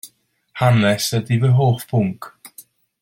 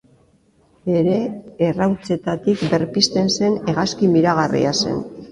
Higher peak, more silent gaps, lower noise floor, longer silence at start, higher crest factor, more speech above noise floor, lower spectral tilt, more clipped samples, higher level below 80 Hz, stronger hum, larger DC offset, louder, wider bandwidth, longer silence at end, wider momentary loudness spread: about the same, -2 dBFS vs 0 dBFS; neither; second, -53 dBFS vs -57 dBFS; second, 0.05 s vs 0.85 s; about the same, 18 dB vs 18 dB; about the same, 37 dB vs 38 dB; about the same, -6 dB/octave vs -5 dB/octave; neither; about the same, -54 dBFS vs -52 dBFS; neither; neither; about the same, -18 LUFS vs -19 LUFS; first, 16 kHz vs 11.5 kHz; first, 0.4 s vs 0 s; first, 20 LU vs 7 LU